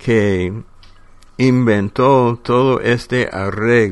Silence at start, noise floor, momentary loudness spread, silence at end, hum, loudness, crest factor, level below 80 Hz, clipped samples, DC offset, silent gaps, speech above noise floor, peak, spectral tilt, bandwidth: 0 s; -42 dBFS; 7 LU; 0 s; none; -15 LUFS; 16 dB; -42 dBFS; under 0.1%; under 0.1%; none; 27 dB; 0 dBFS; -7 dB/octave; 11.5 kHz